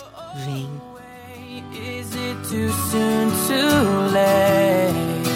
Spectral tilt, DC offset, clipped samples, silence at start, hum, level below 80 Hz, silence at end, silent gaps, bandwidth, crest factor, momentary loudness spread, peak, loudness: -5 dB/octave; under 0.1%; under 0.1%; 0 s; none; -54 dBFS; 0 s; none; 17 kHz; 16 dB; 20 LU; -4 dBFS; -19 LUFS